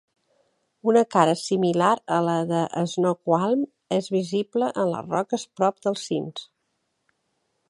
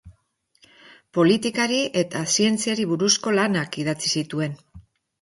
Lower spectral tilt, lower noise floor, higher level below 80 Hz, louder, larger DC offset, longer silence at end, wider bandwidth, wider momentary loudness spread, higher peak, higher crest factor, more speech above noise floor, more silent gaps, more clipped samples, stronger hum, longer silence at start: first, -6 dB/octave vs -3.5 dB/octave; first, -75 dBFS vs -66 dBFS; second, -72 dBFS vs -60 dBFS; about the same, -24 LUFS vs -22 LUFS; neither; first, 1.25 s vs 0.4 s; about the same, 11.5 kHz vs 11.5 kHz; about the same, 8 LU vs 9 LU; about the same, -2 dBFS vs -4 dBFS; about the same, 22 dB vs 18 dB; first, 52 dB vs 44 dB; neither; neither; neither; first, 0.85 s vs 0.05 s